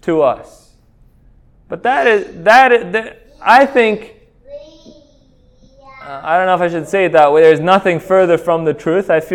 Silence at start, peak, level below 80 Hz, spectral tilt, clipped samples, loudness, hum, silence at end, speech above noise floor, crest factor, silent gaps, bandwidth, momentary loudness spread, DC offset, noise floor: 0.05 s; 0 dBFS; -50 dBFS; -5.5 dB/octave; 0.1%; -12 LUFS; none; 0 s; 37 dB; 14 dB; none; 14 kHz; 12 LU; under 0.1%; -49 dBFS